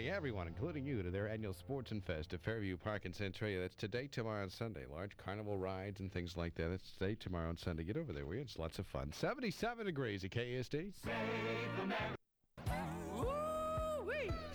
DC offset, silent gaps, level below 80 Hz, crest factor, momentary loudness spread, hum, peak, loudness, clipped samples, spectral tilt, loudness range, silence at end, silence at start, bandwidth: under 0.1%; none; -56 dBFS; 16 dB; 5 LU; none; -28 dBFS; -43 LUFS; under 0.1%; -6.5 dB/octave; 2 LU; 0 s; 0 s; over 20 kHz